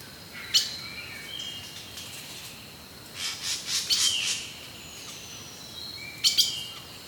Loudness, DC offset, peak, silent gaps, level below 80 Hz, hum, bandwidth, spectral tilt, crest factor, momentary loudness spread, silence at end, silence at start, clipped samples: -27 LUFS; under 0.1%; -8 dBFS; none; -62 dBFS; none; over 20 kHz; 0.5 dB/octave; 24 dB; 18 LU; 0 s; 0 s; under 0.1%